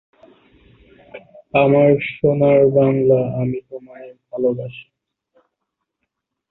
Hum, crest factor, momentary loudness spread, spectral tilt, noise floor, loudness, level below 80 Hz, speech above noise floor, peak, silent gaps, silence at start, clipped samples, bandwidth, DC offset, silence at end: none; 16 dB; 19 LU; -11.5 dB/octave; -78 dBFS; -16 LUFS; -54 dBFS; 62 dB; -2 dBFS; none; 1.15 s; under 0.1%; 4.1 kHz; under 0.1%; 1.7 s